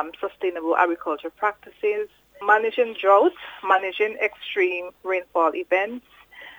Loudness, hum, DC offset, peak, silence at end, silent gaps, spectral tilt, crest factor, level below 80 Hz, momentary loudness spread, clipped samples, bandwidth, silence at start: -23 LUFS; none; under 0.1%; -4 dBFS; 0.05 s; none; -4.5 dB/octave; 20 dB; -68 dBFS; 12 LU; under 0.1%; over 20 kHz; 0 s